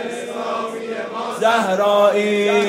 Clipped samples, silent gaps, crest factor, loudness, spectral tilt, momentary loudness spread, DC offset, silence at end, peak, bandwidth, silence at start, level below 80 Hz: under 0.1%; none; 16 dB; -19 LUFS; -4 dB/octave; 12 LU; under 0.1%; 0 s; -2 dBFS; 16 kHz; 0 s; -76 dBFS